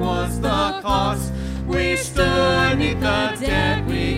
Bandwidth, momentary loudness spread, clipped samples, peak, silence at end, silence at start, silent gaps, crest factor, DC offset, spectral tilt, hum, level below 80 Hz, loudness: 16.5 kHz; 6 LU; under 0.1%; -4 dBFS; 0 s; 0 s; none; 16 dB; under 0.1%; -5 dB/octave; none; -30 dBFS; -20 LUFS